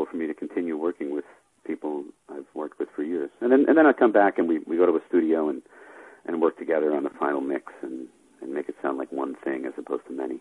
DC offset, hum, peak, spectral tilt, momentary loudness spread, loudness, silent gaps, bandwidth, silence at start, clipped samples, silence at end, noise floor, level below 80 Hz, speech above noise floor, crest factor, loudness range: under 0.1%; none; -6 dBFS; -7 dB/octave; 18 LU; -25 LUFS; none; 11 kHz; 0 s; under 0.1%; 0 s; -48 dBFS; -74 dBFS; 23 dB; 20 dB; 9 LU